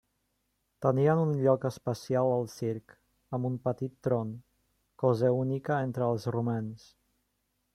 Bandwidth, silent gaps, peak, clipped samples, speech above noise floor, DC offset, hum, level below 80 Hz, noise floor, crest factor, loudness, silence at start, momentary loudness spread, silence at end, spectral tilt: 13.5 kHz; none; -10 dBFS; under 0.1%; 49 dB; under 0.1%; none; -68 dBFS; -78 dBFS; 20 dB; -30 LUFS; 0.8 s; 11 LU; 1 s; -8 dB/octave